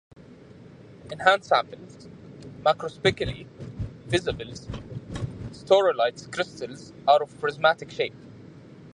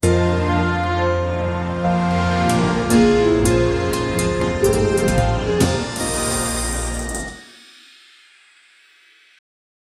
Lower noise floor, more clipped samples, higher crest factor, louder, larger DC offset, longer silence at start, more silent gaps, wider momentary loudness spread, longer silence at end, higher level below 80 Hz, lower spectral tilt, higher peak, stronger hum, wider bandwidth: second, -48 dBFS vs -52 dBFS; neither; first, 24 dB vs 18 dB; second, -25 LUFS vs -19 LUFS; neither; first, 1.05 s vs 0.05 s; neither; first, 21 LU vs 7 LU; second, 0.05 s vs 2.55 s; second, -50 dBFS vs -32 dBFS; about the same, -5 dB/octave vs -5 dB/octave; about the same, -4 dBFS vs -2 dBFS; neither; second, 11 kHz vs 15 kHz